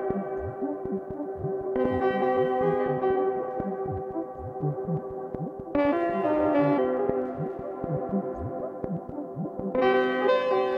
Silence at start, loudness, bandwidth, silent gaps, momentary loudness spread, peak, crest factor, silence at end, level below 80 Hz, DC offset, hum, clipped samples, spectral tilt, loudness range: 0 s; -28 LUFS; 5.6 kHz; none; 11 LU; -10 dBFS; 16 dB; 0 s; -54 dBFS; under 0.1%; none; under 0.1%; -9 dB/octave; 3 LU